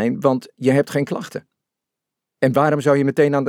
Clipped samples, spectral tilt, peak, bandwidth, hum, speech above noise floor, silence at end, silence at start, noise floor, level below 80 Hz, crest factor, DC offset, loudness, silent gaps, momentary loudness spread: under 0.1%; -7 dB/octave; -2 dBFS; 16.5 kHz; none; 66 dB; 0 s; 0 s; -84 dBFS; -70 dBFS; 16 dB; under 0.1%; -19 LUFS; none; 11 LU